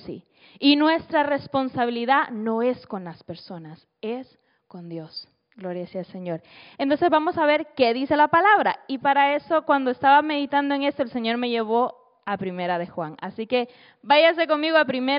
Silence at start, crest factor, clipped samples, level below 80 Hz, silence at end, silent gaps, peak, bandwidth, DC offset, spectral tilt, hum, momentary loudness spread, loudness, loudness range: 0.05 s; 16 dB; under 0.1%; -68 dBFS; 0 s; none; -6 dBFS; 5.4 kHz; under 0.1%; -2 dB/octave; none; 19 LU; -22 LUFS; 13 LU